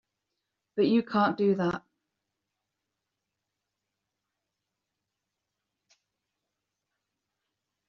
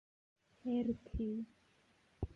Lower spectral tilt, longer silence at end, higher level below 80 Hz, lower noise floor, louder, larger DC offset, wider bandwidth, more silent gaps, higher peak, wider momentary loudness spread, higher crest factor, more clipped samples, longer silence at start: second, -5.5 dB/octave vs -9.5 dB/octave; first, 6.1 s vs 0 s; second, -74 dBFS vs -54 dBFS; first, -86 dBFS vs -72 dBFS; first, -27 LUFS vs -41 LUFS; neither; first, 6.8 kHz vs 6 kHz; neither; first, -12 dBFS vs -26 dBFS; about the same, 11 LU vs 10 LU; first, 22 dB vs 16 dB; neither; about the same, 0.75 s vs 0.65 s